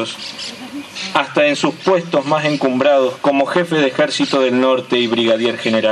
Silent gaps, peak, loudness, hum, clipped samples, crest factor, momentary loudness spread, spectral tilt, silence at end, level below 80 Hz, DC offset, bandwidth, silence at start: none; 0 dBFS; -16 LUFS; none; under 0.1%; 16 dB; 11 LU; -4.5 dB/octave; 0 s; -66 dBFS; under 0.1%; 12 kHz; 0 s